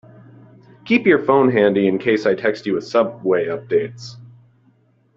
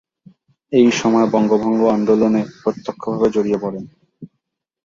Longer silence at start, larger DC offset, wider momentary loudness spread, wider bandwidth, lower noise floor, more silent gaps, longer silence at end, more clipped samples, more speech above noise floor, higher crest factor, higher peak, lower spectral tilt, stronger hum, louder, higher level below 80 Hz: first, 0.85 s vs 0.7 s; neither; about the same, 8 LU vs 10 LU; about the same, 7.6 kHz vs 7.6 kHz; second, -57 dBFS vs -75 dBFS; neither; first, 0.9 s vs 0.6 s; neither; second, 40 dB vs 59 dB; about the same, 18 dB vs 16 dB; about the same, 0 dBFS vs -2 dBFS; about the same, -7 dB/octave vs -6 dB/octave; neither; about the same, -17 LUFS vs -17 LUFS; second, -62 dBFS vs -56 dBFS